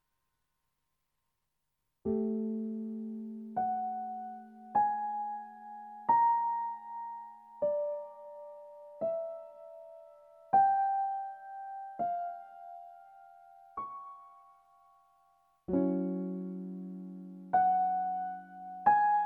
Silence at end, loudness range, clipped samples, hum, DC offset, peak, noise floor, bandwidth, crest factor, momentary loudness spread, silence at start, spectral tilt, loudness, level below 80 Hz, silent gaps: 0 s; 9 LU; under 0.1%; none; under 0.1%; -14 dBFS; -85 dBFS; 3.3 kHz; 22 dB; 22 LU; 2.05 s; -10 dB/octave; -33 LUFS; -74 dBFS; none